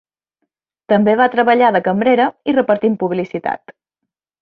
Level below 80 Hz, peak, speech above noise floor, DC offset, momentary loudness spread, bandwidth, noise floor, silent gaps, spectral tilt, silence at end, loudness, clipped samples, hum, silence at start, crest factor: -62 dBFS; -2 dBFS; 65 dB; under 0.1%; 10 LU; 5.2 kHz; -79 dBFS; none; -8.5 dB/octave; 0.7 s; -15 LUFS; under 0.1%; none; 0.9 s; 14 dB